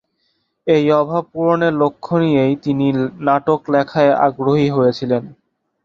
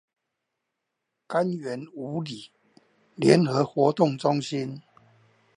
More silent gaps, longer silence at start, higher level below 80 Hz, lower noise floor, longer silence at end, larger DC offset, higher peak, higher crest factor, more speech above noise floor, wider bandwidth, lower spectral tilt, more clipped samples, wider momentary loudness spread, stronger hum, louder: neither; second, 0.65 s vs 1.3 s; first, -54 dBFS vs -74 dBFS; second, -67 dBFS vs -82 dBFS; second, 0.5 s vs 0.75 s; neither; about the same, -2 dBFS vs -4 dBFS; second, 14 dB vs 24 dB; second, 51 dB vs 58 dB; second, 7.2 kHz vs 11.5 kHz; first, -8 dB/octave vs -6.5 dB/octave; neither; second, 5 LU vs 16 LU; neither; first, -16 LUFS vs -25 LUFS